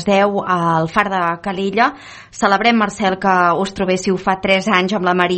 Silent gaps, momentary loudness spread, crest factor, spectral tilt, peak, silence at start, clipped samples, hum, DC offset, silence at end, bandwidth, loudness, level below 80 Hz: none; 6 LU; 16 dB; -5 dB/octave; 0 dBFS; 0 s; under 0.1%; none; under 0.1%; 0 s; 8.8 kHz; -16 LUFS; -48 dBFS